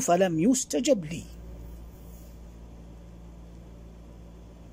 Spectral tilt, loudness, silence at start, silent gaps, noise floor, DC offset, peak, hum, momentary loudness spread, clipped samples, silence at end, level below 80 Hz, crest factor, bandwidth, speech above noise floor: -4.5 dB/octave; -25 LUFS; 0 s; none; -47 dBFS; under 0.1%; -10 dBFS; none; 25 LU; under 0.1%; 0.05 s; -48 dBFS; 20 dB; 16 kHz; 22 dB